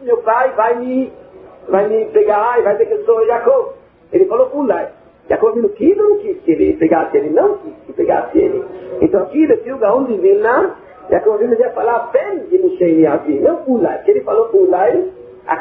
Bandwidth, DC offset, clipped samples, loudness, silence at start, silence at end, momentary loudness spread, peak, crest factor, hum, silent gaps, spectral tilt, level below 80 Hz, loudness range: 3.7 kHz; under 0.1%; under 0.1%; -14 LUFS; 0 s; 0 s; 7 LU; 0 dBFS; 14 dB; none; none; -6.5 dB/octave; -50 dBFS; 1 LU